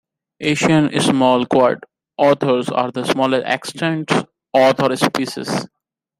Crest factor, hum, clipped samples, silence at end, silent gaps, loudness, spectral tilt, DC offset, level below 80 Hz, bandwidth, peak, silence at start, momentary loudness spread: 16 dB; none; under 0.1%; 0.55 s; none; -17 LUFS; -5 dB/octave; under 0.1%; -60 dBFS; 15.5 kHz; -2 dBFS; 0.4 s; 9 LU